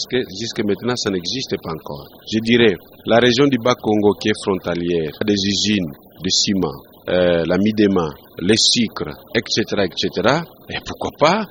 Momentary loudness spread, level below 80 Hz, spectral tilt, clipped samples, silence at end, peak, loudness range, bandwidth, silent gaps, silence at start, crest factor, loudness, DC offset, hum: 13 LU; -48 dBFS; -4 dB/octave; under 0.1%; 0 s; 0 dBFS; 2 LU; 16.5 kHz; none; 0 s; 18 dB; -18 LUFS; under 0.1%; none